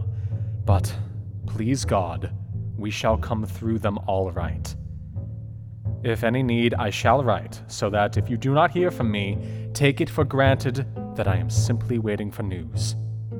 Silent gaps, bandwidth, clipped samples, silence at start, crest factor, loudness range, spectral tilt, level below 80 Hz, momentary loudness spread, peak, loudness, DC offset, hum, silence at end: none; 16 kHz; under 0.1%; 0 s; 20 dB; 5 LU; -6 dB/octave; -44 dBFS; 12 LU; -4 dBFS; -25 LUFS; under 0.1%; none; 0 s